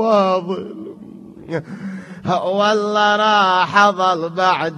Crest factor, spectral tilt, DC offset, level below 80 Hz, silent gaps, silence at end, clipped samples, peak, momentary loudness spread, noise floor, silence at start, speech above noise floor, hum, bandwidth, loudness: 18 dB; -4.5 dB/octave; under 0.1%; -62 dBFS; none; 0 s; under 0.1%; 0 dBFS; 17 LU; -37 dBFS; 0 s; 21 dB; none; 10.5 kHz; -16 LUFS